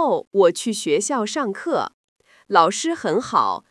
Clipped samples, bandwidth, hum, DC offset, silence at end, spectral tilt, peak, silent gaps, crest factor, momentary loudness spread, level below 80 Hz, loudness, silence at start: under 0.1%; 12 kHz; none; under 0.1%; 0.1 s; -3.5 dB/octave; 0 dBFS; 0.27-0.31 s, 1.94-2.16 s; 20 dB; 7 LU; -72 dBFS; -20 LUFS; 0 s